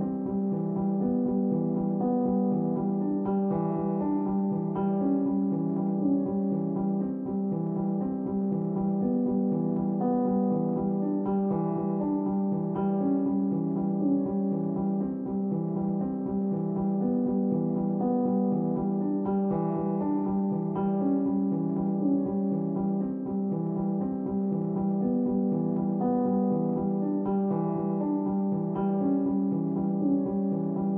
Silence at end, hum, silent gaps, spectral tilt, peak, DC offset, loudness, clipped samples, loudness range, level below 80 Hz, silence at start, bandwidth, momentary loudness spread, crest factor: 0 s; none; none; -14 dB/octave; -14 dBFS; under 0.1%; -28 LUFS; under 0.1%; 1 LU; -60 dBFS; 0 s; 2.1 kHz; 3 LU; 12 dB